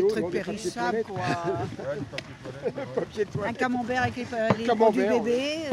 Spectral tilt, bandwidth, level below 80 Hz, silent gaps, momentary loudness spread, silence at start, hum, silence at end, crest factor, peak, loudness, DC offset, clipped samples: -5.5 dB/octave; 13.5 kHz; -58 dBFS; none; 12 LU; 0 s; none; 0 s; 20 dB; -8 dBFS; -27 LUFS; under 0.1%; under 0.1%